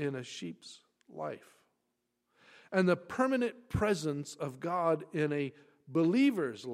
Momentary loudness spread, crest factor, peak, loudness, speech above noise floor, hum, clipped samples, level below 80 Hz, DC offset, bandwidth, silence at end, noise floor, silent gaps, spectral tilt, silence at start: 14 LU; 20 dB; -14 dBFS; -33 LUFS; 50 dB; none; under 0.1%; -60 dBFS; under 0.1%; 14.5 kHz; 0 s; -82 dBFS; none; -6.5 dB/octave; 0 s